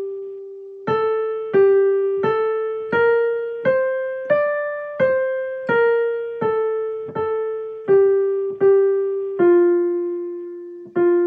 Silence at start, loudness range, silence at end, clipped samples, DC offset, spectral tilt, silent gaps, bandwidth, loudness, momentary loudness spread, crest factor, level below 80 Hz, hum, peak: 0 s; 3 LU; 0 s; under 0.1%; under 0.1%; -9 dB/octave; none; 4.5 kHz; -19 LUFS; 12 LU; 12 dB; -70 dBFS; none; -6 dBFS